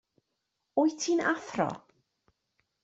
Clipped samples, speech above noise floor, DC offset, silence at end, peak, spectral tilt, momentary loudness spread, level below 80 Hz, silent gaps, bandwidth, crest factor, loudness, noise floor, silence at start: under 0.1%; 54 dB; under 0.1%; 1.05 s; -12 dBFS; -4 dB/octave; 6 LU; -74 dBFS; none; 8 kHz; 20 dB; -30 LUFS; -82 dBFS; 0.75 s